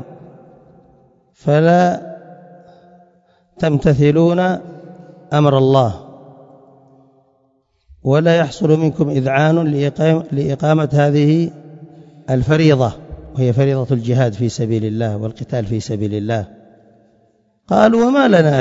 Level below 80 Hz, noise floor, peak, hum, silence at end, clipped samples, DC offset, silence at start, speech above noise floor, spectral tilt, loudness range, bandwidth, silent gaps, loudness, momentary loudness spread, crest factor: -46 dBFS; -61 dBFS; 0 dBFS; none; 0 s; under 0.1%; under 0.1%; 0 s; 47 dB; -7.5 dB/octave; 4 LU; 7.8 kHz; none; -15 LUFS; 12 LU; 16 dB